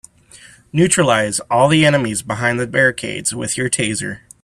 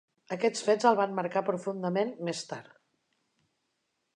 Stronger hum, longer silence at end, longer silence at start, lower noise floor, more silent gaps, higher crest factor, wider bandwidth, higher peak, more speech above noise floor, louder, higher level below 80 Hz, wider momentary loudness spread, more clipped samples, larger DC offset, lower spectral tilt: neither; second, 0.25 s vs 1.55 s; first, 0.45 s vs 0.3 s; second, -44 dBFS vs -80 dBFS; neither; about the same, 18 dB vs 22 dB; first, 13.5 kHz vs 11 kHz; first, 0 dBFS vs -10 dBFS; second, 28 dB vs 51 dB; first, -16 LUFS vs -29 LUFS; first, -50 dBFS vs -86 dBFS; second, 8 LU vs 14 LU; neither; neither; about the same, -4 dB/octave vs -5 dB/octave